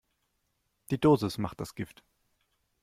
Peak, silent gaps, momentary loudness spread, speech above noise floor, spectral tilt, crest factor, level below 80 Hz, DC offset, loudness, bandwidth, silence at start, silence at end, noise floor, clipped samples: -12 dBFS; none; 16 LU; 49 dB; -7 dB/octave; 20 dB; -60 dBFS; under 0.1%; -29 LUFS; 15.5 kHz; 0.9 s; 1 s; -78 dBFS; under 0.1%